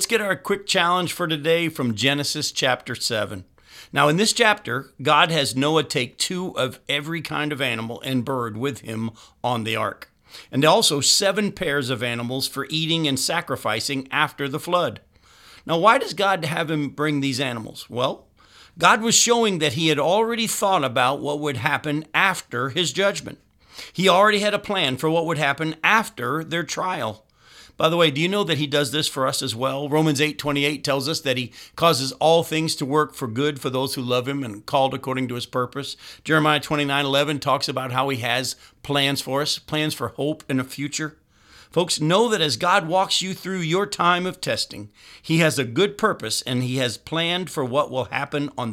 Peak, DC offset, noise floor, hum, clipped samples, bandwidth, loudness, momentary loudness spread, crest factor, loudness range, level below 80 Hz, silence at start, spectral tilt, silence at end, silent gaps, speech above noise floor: 0 dBFS; under 0.1%; -52 dBFS; none; under 0.1%; 17 kHz; -21 LUFS; 10 LU; 22 dB; 4 LU; -60 dBFS; 0 s; -3.5 dB/octave; 0 s; none; 29 dB